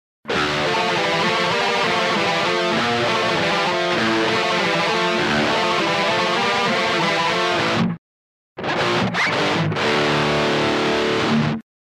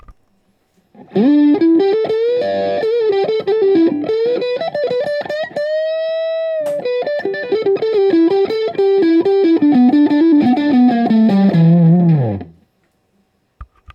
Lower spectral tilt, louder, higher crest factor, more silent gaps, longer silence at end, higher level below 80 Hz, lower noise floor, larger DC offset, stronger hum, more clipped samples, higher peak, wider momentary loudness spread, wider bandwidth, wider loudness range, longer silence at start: second, -4 dB/octave vs -9.5 dB/octave; second, -19 LUFS vs -14 LUFS; about the same, 12 dB vs 12 dB; first, 7.98-8.56 s vs none; first, 0.25 s vs 0.05 s; about the same, -52 dBFS vs -54 dBFS; first, under -90 dBFS vs -61 dBFS; neither; neither; neither; second, -6 dBFS vs -2 dBFS; second, 2 LU vs 9 LU; first, 14.5 kHz vs 6.6 kHz; second, 2 LU vs 7 LU; first, 0.25 s vs 0.1 s